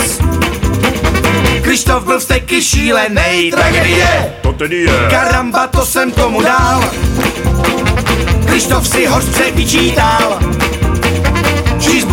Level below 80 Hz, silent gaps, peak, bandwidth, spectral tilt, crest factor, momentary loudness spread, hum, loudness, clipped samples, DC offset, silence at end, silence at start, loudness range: -20 dBFS; none; 0 dBFS; 18 kHz; -4 dB/octave; 10 dB; 4 LU; none; -11 LUFS; under 0.1%; under 0.1%; 0 s; 0 s; 1 LU